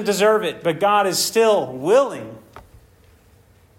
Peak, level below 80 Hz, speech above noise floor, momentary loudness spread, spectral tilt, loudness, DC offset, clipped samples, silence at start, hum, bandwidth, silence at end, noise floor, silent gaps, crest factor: -4 dBFS; -58 dBFS; 34 dB; 8 LU; -3 dB/octave; -18 LUFS; under 0.1%; under 0.1%; 0 s; none; 16.5 kHz; 1.2 s; -52 dBFS; none; 16 dB